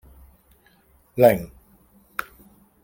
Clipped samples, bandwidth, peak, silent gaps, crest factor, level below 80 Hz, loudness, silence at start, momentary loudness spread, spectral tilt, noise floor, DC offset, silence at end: under 0.1%; 17 kHz; -2 dBFS; none; 24 dB; -54 dBFS; -21 LUFS; 1.15 s; 18 LU; -6.5 dB/octave; -58 dBFS; under 0.1%; 1.4 s